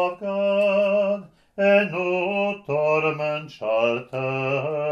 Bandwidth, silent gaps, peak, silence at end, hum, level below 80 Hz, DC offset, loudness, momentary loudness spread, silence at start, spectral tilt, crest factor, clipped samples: 7 kHz; none; -6 dBFS; 0 s; none; -68 dBFS; under 0.1%; -23 LUFS; 8 LU; 0 s; -7 dB/octave; 16 dB; under 0.1%